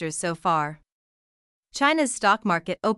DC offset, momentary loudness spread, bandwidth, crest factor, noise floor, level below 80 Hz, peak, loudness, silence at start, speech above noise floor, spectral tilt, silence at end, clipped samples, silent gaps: under 0.1%; 8 LU; 13.5 kHz; 18 dB; under -90 dBFS; -64 dBFS; -8 dBFS; -23 LUFS; 0 s; over 66 dB; -3.5 dB/octave; 0 s; under 0.1%; 0.92-1.63 s